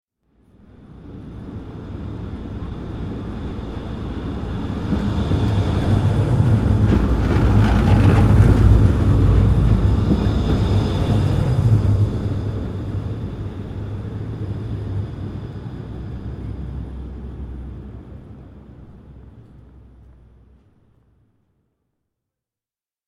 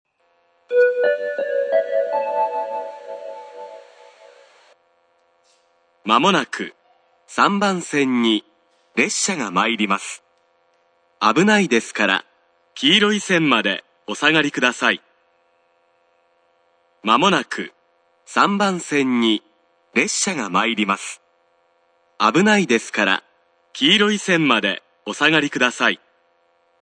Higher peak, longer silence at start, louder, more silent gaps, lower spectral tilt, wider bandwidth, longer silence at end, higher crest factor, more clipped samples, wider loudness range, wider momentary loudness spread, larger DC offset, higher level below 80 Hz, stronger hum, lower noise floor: about the same, 0 dBFS vs 0 dBFS; about the same, 0.8 s vs 0.7 s; about the same, -19 LUFS vs -18 LUFS; neither; first, -8.5 dB/octave vs -3.5 dB/octave; about the same, 10.5 kHz vs 9.8 kHz; first, 3.3 s vs 0.85 s; about the same, 18 dB vs 20 dB; neither; first, 18 LU vs 6 LU; first, 19 LU vs 16 LU; neither; first, -26 dBFS vs -70 dBFS; neither; first, under -90 dBFS vs -63 dBFS